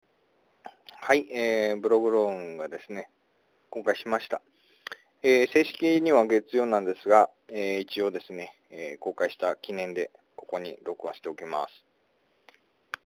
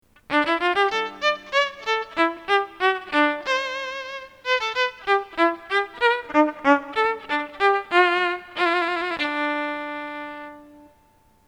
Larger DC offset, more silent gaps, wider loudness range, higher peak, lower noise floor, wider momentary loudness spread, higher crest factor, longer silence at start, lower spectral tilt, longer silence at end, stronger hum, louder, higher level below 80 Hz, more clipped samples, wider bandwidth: neither; neither; first, 10 LU vs 2 LU; second, -6 dBFS vs -2 dBFS; first, -70 dBFS vs -58 dBFS; first, 19 LU vs 11 LU; about the same, 22 dB vs 22 dB; first, 0.65 s vs 0.3 s; first, -4.5 dB/octave vs -2.5 dB/octave; first, 1.45 s vs 0.8 s; neither; second, -27 LUFS vs -22 LUFS; second, -76 dBFS vs -62 dBFS; neither; first, over 20 kHz vs 13 kHz